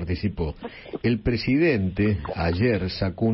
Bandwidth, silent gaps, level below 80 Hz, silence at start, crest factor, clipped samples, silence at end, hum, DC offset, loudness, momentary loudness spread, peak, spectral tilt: 5.8 kHz; none; -40 dBFS; 0 s; 14 dB; under 0.1%; 0 s; none; under 0.1%; -24 LUFS; 10 LU; -10 dBFS; -11 dB/octave